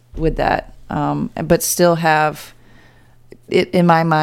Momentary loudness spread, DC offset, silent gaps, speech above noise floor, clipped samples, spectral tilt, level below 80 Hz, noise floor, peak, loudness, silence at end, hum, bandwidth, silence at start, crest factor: 9 LU; under 0.1%; none; 31 dB; under 0.1%; -5 dB/octave; -36 dBFS; -46 dBFS; 0 dBFS; -17 LUFS; 0 s; none; 17 kHz; 0.15 s; 18 dB